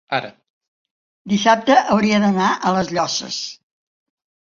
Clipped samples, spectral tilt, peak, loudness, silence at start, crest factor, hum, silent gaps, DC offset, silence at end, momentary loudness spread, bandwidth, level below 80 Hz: under 0.1%; -4.5 dB/octave; -2 dBFS; -17 LUFS; 0.1 s; 18 dB; none; 0.50-0.61 s, 0.68-0.85 s, 0.91-1.25 s; under 0.1%; 0.9 s; 12 LU; 7.6 kHz; -58 dBFS